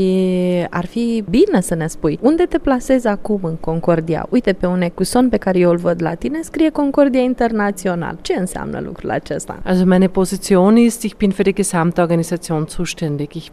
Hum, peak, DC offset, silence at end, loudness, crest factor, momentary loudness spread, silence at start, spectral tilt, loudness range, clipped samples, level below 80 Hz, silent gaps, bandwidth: none; 0 dBFS; under 0.1%; 0.05 s; -17 LUFS; 16 dB; 8 LU; 0 s; -6.5 dB/octave; 3 LU; under 0.1%; -38 dBFS; none; 14.5 kHz